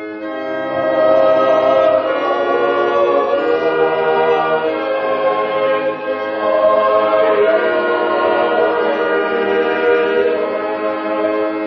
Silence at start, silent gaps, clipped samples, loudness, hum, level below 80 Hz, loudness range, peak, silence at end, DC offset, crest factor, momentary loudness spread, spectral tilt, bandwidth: 0 s; none; under 0.1%; -15 LUFS; none; -60 dBFS; 2 LU; 0 dBFS; 0 s; under 0.1%; 14 dB; 7 LU; -6.5 dB/octave; 6.4 kHz